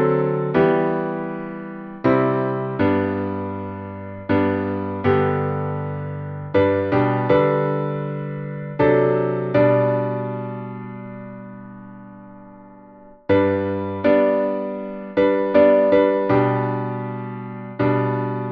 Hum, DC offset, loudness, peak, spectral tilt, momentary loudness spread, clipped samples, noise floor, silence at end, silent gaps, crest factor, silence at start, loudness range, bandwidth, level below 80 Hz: none; under 0.1%; -20 LUFS; -2 dBFS; -10.5 dB/octave; 16 LU; under 0.1%; -45 dBFS; 0 s; none; 18 dB; 0 s; 6 LU; 5.2 kHz; -54 dBFS